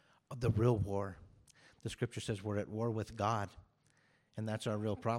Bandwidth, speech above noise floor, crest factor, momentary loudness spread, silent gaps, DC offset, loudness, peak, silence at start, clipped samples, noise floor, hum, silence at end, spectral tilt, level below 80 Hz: 13 kHz; 36 dB; 18 dB; 15 LU; none; under 0.1%; -38 LUFS; -20 dBFS; 0.3 s; under 0.1%; -72 dBFS; none; 0 s; -7 dB/octave; -60 dBFS